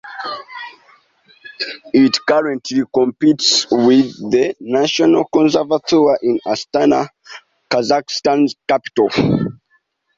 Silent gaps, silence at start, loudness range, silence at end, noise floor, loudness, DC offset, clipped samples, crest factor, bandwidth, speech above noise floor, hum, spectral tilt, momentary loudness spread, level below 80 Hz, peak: none; 0.05 s; 4 LU; 0.65 s; -62 dBFS; -15 LUFS; under 0.1%; under 0.1%; 16 dB; 7.8 kHz; 47 dB; none; -4.5 dB/octave; 13 LU; -54 dBFS; 0 dBFS